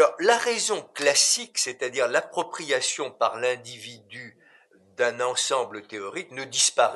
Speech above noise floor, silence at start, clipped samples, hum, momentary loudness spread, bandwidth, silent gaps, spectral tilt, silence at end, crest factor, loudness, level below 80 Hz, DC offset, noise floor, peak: 32 dB; 0 s; under 0.1%; none; 16 LU; 12 kHz; none; -0.5 dB/octave; 0 s; 20 dB; -24 LUFS; -82 dBFS; under 0.1%; -58 dBFS; -6 dBFS